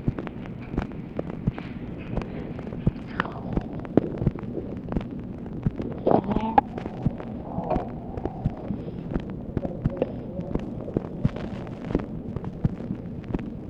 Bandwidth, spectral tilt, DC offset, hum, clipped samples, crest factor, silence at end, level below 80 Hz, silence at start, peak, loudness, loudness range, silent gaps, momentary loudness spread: 7.4 kHz; -9.5 dB/octave; under 0.1%; none; under 0.1%; 28 dB; 0 s; -40 dBFS; 0 s; 0 dBFS; -30 LUFS; 4 LU; none; 11 LU